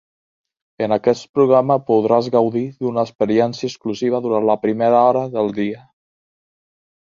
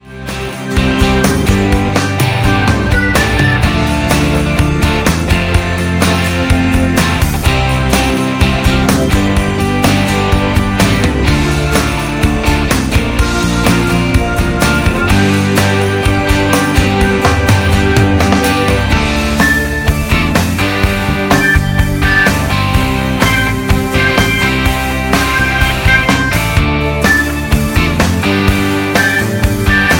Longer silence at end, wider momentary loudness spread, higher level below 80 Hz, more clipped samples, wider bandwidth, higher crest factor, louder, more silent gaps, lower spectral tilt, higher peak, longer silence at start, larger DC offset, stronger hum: first, 1.25 s vs 0 s; first, 10 LU vs 3 LU; second, -60 dBFS vs -18 dBFS; neither; second, 7.4 kHz vs 17 kHz; about the same, 16 dB vs 12 dB; second, -18 LUFS vs -12 LUFS; first, 1.29-1.34 s, 3.15-3.19 s vs none; first, -7 dB/octave vs -5 dB/octave; about the same, -2 dBFS vs 0 dBFS; first, 0.8 s vs 0.05 s; neither; neither